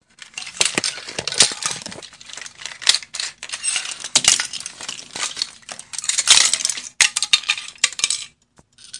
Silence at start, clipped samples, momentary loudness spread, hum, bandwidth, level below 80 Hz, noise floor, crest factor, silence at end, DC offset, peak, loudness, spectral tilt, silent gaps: 0.35 s; under 0.1%; 18 LU; none; 12 kHz; -60 dBFS; -56 dBFS; 22 dB; 0 s; under 0.1%; 0 dBFS; -18 LUFS; 1.5 dB/octave; none